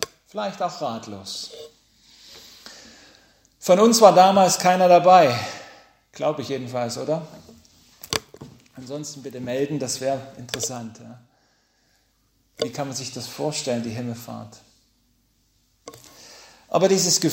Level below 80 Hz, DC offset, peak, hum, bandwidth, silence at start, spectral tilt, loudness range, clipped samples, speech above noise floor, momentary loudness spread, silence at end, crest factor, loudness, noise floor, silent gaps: -64 dBFS; under 0.1%; 0 dBFS; none; 16 kHz; 0 s; -3.5 dB/octave; 16 LU; under 0.1%; 45 dB; 23 LU; 0 s; 22 dB; -21 LUFS; -65 dBFS; none